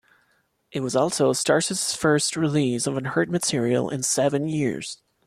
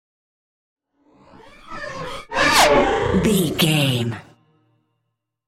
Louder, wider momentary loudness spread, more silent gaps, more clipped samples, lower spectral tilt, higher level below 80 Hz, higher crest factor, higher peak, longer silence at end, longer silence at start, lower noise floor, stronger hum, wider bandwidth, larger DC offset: second, -23 LUFS vs -17 LUFS; second, 6 LU vs 19 LU; neither; neither; about the same, -4 dB/octave vs -4 dB/octave; second, -62 dBFS vs -42 dBFS; about the same, 16 dB vs 20 dB; second, -8 dBFS vs 0 dBFS; second, 0.3 s vs 1.25 s; second, 0.75 s vs 1.65 s; second, -67 dBFS vs -76 dBFS; neither; second, 14.5 kHz vs 16 kHz; neither